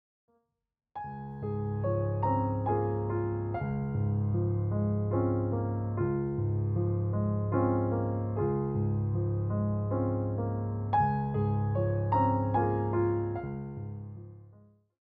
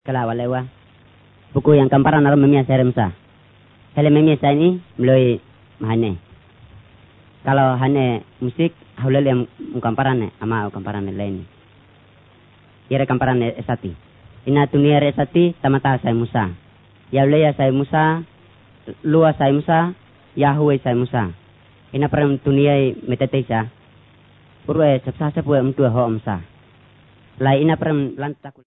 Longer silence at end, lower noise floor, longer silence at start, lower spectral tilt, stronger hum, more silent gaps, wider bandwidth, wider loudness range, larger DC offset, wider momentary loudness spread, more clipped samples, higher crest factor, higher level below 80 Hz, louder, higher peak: first, 0.5 s vs 0.15 s; first, -75 dBFS vs -50 dBFS; first, 0.95 s vs 0.05 s; second, -10.5 dB/octave vs -12.5 dB/octave; neither; neither; second, 3.5 kHz vs 4 kHz; second, 2 LU vs 6 LU; neither; second, 10 LU vs 13 LU; neither; about the same, 14 dB vs 18 dB; about the same, -52 dBFS vs -50 dBFS; second, -31 LUFS vs -18 LUFS; second, -16 dBFS vs 0 dBFS